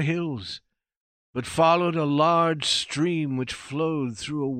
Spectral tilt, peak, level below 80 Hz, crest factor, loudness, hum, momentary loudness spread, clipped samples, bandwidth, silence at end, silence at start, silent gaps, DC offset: -5 dB/octave; -8 dBFS; -60 dBFS; 16 dB; -24 LUFS; none; 14 LU; under 0.1%; 13.5 kHz; 0 s; 0 s; 0.96-1.34 s; under 0.1%